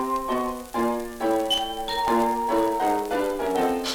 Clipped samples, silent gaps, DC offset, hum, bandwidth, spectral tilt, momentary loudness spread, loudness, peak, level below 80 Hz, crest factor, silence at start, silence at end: under 0.1%; none; under 0.1%; none; over 20 kHz; -3.5 dB/octave; 5 LU; -25 LUFS; -10 dBFS; -48 dBFS; 14 dB; 0 s; 0 s